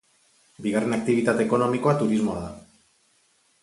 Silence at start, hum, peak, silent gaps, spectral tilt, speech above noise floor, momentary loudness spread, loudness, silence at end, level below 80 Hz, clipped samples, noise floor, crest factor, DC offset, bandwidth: 0.6 s; none; -6 dBFS; none; -6.5 dB/octave; 42 dB; 10 LU; -24 LUFS; 1.05 s; -56 dBFS; under 0.1%; -64 dBFS; 18 dB; under 0.1%; 11.5 kHz